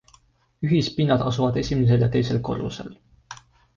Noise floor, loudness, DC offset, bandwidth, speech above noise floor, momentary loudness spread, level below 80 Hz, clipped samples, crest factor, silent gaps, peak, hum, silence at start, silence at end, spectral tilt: -59 dBFS; -22 LUFS; under 0.1%; 7.2 kHz; 37 dB; 23 LU; -46 dBFS; under 0.1%; 16 dB; none; -8 dBFS; none; 0.6 s; 0.4 s; -7.5 dB/octave